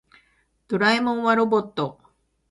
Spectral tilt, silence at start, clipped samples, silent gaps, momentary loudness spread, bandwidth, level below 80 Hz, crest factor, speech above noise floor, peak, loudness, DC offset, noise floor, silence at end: -5.5 dB/octave; 0.7 s; under 0.1%; none; 10 LU; 11.5 kHz; -66 dBFS; 20 dB; 44 dB; -4 dBFS; -22 LUFS; under 0.1%; -65 dBFS; 0.6 s